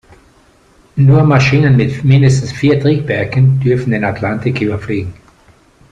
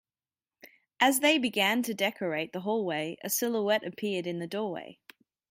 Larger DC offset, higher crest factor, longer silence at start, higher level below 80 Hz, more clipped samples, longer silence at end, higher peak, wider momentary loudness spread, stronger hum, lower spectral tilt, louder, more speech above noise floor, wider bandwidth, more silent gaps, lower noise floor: neither; second, 12 dB vs 20 dB; first, 0.95 s vs 0.65 s; first, -40 dBFS vs -80 dBFS; neither; first, 0.8 s vs 0.6 s; first, -2 dBFS vs -12 dBFS; about the same, 9 LU vs 10 LU; neither; first, -7.5 dB/octave vs -3 dB/octave; first, -12 LUFS vs -29 LUFS; second, 37 dB vs over 61 dB; second, 8.8 kHz vs 16.5 kHz; neither; second, -48 dBFS vs under -90 dBFS